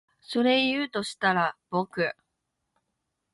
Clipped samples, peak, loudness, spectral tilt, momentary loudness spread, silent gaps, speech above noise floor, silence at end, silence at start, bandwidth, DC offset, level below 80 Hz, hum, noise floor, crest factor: under 0.1%; -10 dBFS; -26 LUFS; -4.5 dB/octave; 9 LU; none; 54 dB; 1.2 s; 0.3 s; 11.5 kHz; under 0.1%; -70 dBFS; none; -81 dBFS; 18 dB